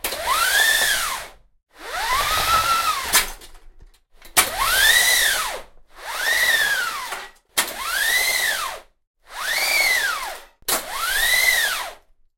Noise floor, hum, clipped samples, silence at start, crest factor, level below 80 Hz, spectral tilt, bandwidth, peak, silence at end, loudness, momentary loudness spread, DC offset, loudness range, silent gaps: -48 dBFS; none; under 0.1%; 0.05 s; 22 dB; -44 dBFS; 1 dB/octave; 16.5 kHz; 0 dBFS; 0.45 s; -18 LUFS; 16 LU; under 0.1%; 3 LU; 9.07-9.14 s